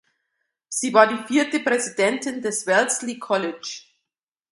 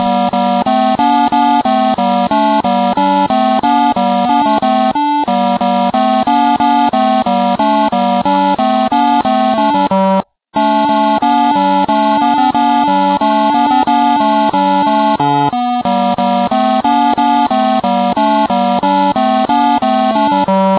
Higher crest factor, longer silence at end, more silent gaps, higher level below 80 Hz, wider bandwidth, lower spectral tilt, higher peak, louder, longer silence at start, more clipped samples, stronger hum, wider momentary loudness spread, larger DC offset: first, 22 dB vs 12 dB; first, 0.7 s vs 0 s; neither; second, -74 dBFS vs -48 dBFS; first, 11.5 kHz vs 4 kHz; second, -2.5 dB/octave vs -9.5 dB/octave; about the same, 0 dBFS vs 0 dBFS; second, -21 LUFS vs -12 LUFS; first, 0.7 s vs 0 s; neither; neither; first, 12 LU vs 2 LU; neither